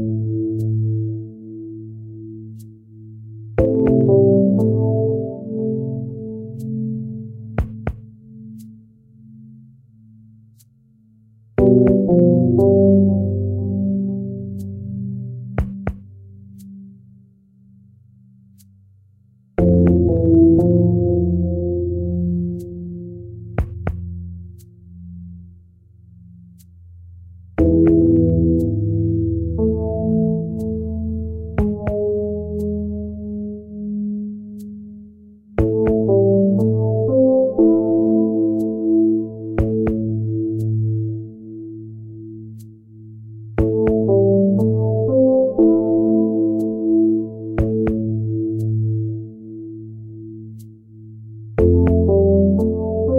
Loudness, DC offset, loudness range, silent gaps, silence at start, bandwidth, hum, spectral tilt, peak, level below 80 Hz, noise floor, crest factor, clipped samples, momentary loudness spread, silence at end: -18 LUFS; under 0.1%; 14 LU; none; 0 s; 3 kHz; none; -12 dB/octave; -2 dBFS; -34 dBFS; -53 dBFS; 18 dB; under 0.1%; 21 LU; 0 s